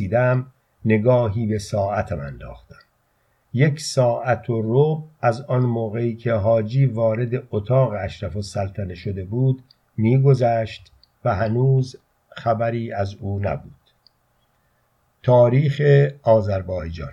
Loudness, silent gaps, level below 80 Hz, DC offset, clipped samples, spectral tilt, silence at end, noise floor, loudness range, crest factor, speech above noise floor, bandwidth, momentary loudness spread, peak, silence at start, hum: -21 LUFS; none; -48 dBFS; under 0.1%; under 0.1%; -7.5 dB/octave; 0 s; -65 dBFS; 4 LU; 18 dB; 45 dB; 10.5 kHz; 13 LU; -4 dBFS; 0 s; none